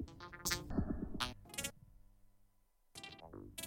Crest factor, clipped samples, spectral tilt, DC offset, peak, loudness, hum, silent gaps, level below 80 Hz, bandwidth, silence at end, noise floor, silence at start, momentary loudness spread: 24 dB; under 0.1%; -3 dB/octave; under 0.1%; -20 dBFS; -43 LUFS; none; none; -54 dBFS; 16.5 kHz; 0 s; -73 dBFS; 0 s; 14 LU